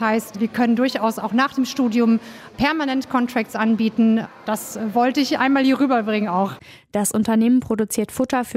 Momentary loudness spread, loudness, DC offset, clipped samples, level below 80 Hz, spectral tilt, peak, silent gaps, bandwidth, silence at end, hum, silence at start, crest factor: 7 LU; -20 LUFS; under 0.1%; under 0.1%; -54 dBFS; -4.5 dB/octave; -6 dBFS; none; 16 kHz; 0 s; none; 0 s; 14 dB